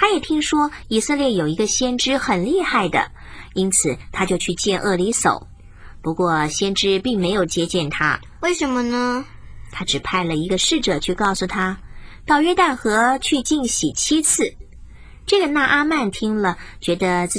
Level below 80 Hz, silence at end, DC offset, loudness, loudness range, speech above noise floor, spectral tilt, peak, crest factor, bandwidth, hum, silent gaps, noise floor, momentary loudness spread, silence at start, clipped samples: -40 dBFS; 0 s; under 0.1%; -19 LUFS; 3 LU; 20 dB; -3 dB/octave; -2 dBFS; 16 dB; 10.5 kHz; none; none; -39 dBFS; 8 LU; 0 s; under 0.1%